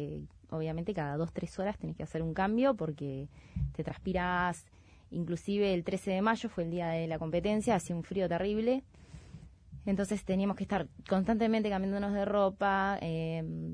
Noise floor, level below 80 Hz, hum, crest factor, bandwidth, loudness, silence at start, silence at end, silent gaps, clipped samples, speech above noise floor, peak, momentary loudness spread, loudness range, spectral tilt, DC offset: -52 dBFS; -52 dBFS; none; 16 dB; 11 kHz; -33 LUFS; 0 s; 0 s; none; under 0.1%; 20 dB; -16 dBFS; 11 LU; 3 LU; -6.5 dB/octave; under 0.1%